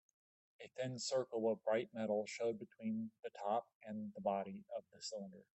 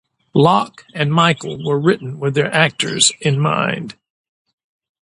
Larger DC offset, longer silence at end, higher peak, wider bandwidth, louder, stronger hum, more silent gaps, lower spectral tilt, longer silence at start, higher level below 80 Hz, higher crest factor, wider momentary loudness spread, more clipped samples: neither; second, 0.1 s vs 1.1 s; second, -26 dBFS vs 0 dBFS; second, 8.4 kHz vs 11.5 kHz; second, -43 LUFS vs -16 LUFS; neither; first, 3.19-3.23 s, 3.75-3.81 s vs none; about the same, -4.5 dB/octave vs -4 dB/octave; first, 0.6 s vs 0.35 s; second, -88 dBFS vs -58 dBFS; about the same, 16 dB vs 18 dB; first, 11 LU vs 8 LU; neither